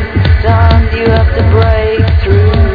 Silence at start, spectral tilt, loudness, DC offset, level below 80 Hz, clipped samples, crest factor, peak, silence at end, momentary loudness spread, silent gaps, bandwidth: 0 s; -9.5 dB/octave; -9 LUFS; 0.8%; -12 dBFS; 2%; 8 dB; 0 dBFS; 0 s; 3 LU; none; 5 kHz